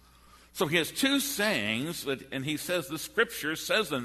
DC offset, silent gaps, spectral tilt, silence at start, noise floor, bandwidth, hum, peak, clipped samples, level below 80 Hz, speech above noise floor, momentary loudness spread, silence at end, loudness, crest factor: under 0.1%; none; -3 dB/octave; 0.35 s; -57 dBFS; 13.5 kHz; none; -10 dBFS; under 0.1%; -62 dBFS; 27 dB; 7 LU; 0 s; -29 LUFS; 20 dB